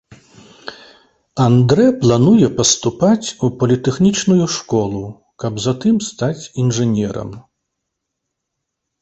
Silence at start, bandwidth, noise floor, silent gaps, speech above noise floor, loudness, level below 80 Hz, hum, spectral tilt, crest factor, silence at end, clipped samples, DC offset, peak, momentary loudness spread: 0.65 s; 8.4 kHz; -77 dBFS; none; 63 dB; -15 LUFS; -48 dBFS; none; -5.5 dB/octave; 16 dB; 1.65 s; under 0.1%; under 0.1%; 0 dBFS; 17 LU